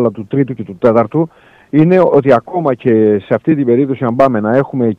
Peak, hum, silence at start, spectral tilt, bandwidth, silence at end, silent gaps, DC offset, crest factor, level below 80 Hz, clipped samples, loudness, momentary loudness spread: 0 dBFS; none; 0 s; -10 dB/octave; 6.8 kHz; 0.05 s; none; under 0.1%; 12 dB; -54 dBFS; under 0.1%; -12 LUFS; 7 LU